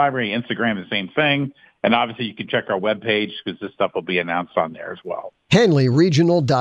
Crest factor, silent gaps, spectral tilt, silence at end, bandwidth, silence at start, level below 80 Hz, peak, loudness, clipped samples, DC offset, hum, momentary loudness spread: 18 dB; none; -6 dB/octave; 0 s; 8.6 kHz; 0 s; -58 dBFS; -2 dBFS; -20 LUFS; under 0.1%; under 0.1%; none; 14 LU